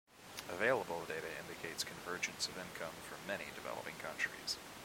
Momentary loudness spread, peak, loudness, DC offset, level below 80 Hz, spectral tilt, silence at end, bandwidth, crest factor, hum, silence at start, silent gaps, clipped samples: 11 LU; -20 dBFS; -41 LUFS; under 0.1%; -72 dBFS; -2 dB/octave; 0 s; 16.5 kHz; 22 dB; none; 0.1 s; none; under 0.1%